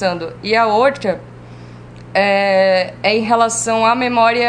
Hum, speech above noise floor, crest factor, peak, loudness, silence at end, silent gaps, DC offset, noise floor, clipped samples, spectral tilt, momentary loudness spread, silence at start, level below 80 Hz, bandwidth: 60 Hz at -40 dBFS; 21 dB; 16 dB; 0 dBFS; -15 LUFS; 0 s; none; under 0.1%; -35 dBFS; under 0.1%; -3.5 dB/octave; 8 LU; 0 s; -50 dBFS; 10 kHz